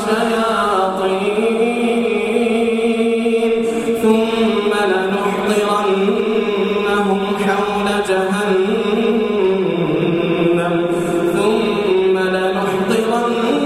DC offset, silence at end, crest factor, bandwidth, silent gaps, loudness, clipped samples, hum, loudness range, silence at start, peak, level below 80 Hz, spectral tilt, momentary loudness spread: under 0.1%; 0 s; 14 dB; 14.5 kHz; none; -16 LUFS; under 0.1%; none; 1 LU; 0 s; -2 dBFS; -50 dBFS; -5.5 dB/octave; 2 LU